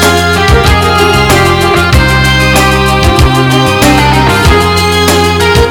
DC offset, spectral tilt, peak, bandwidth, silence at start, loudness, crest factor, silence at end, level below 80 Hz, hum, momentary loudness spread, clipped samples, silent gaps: under 0.1%; -4.5 dB/octave; 0 dBFS; 19 kHz; 0 s; -6 LUFS; 6 dB; 0 s; -16 dBFS; none; 1 LU; 0.8%; none